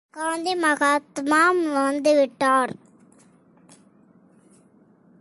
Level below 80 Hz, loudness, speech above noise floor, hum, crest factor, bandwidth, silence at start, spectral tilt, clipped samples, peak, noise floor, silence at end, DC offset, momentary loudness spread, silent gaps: -72 dBFS; -21 LUFS; 35 dB; none; 16 dB; 11.5 kHz; 0.15 s; -3 dB/octave; under 0.1%; -8 dBFS; -56 dBFS; 2.5 s; under 0.1%; 9 LU; none